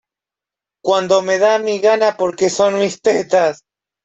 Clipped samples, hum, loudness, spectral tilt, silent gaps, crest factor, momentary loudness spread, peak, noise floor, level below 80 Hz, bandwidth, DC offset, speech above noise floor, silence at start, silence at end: under 0.1%; none; -15 LUFS; -3.5 dB/octave; none; 14 dB; 4 LU; -2 dBFS; -87 dBFS; -62 dBFS; 8.4 kHz; under 0.1%; 73 dB; 0.85 s; 0.5 s